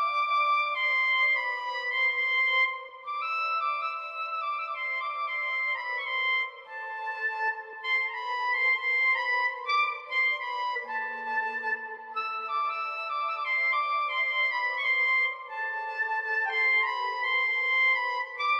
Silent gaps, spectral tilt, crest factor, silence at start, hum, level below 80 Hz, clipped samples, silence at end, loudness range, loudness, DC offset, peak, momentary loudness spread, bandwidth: none; 1 dB/octave; 12 dB; 0 s; none; -90 dBFS; under 0.1%; 0 s; 4 LU; -27 LUFS; under 0.1%; -16 dBFS; 9 LU; 8.4 kHz